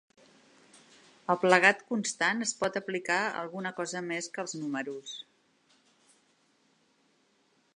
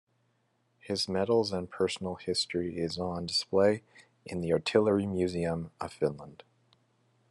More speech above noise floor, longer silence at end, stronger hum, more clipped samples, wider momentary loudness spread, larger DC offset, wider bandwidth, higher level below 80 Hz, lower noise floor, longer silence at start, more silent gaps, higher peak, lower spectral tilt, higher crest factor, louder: about the same, 40 dB vs 43 dB; first, 2.55 s vs 0.95 s; neither; neither; first, 16 LU vs 11 LU; neither; about the same, 11 kHz vs 12 kHz; second, -82 dBFS vs -66 dBFS; about the same, -70 dBFS vs -73 dBFS; first, 1.3 s vs 0.85 s; neither; first, -6 dBFS vs -10 dBFS; second, -3 dB/octave vs -5 dB/octave; first, 28 dB vs 22 dB; about the same, -29 LUFS vs -30 LUFS